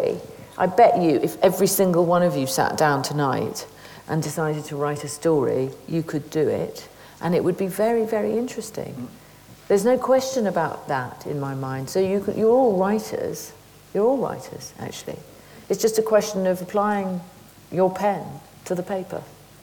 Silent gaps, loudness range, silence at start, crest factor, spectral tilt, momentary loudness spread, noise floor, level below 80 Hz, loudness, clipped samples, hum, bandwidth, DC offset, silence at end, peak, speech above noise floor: none; 5 LU; 0 s; 18 dB; -5.5 dB/octave; 16 LU; -47 dBFS; -60 dBFS; -22 LUFS; under 0.1%; none; 20 kHz; under 0.1%; 0.3 s; -4 dBFS; 25 dB